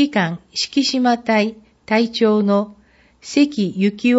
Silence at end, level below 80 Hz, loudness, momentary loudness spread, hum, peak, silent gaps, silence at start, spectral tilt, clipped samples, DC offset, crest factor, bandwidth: 0 s; -60 dBFS; -18 LUFS; 6 LU; none; -4 dBFS; none; 0 s; -5 dB/octave; under 0.1%; under 0.1%; 14 dB; 8 kHz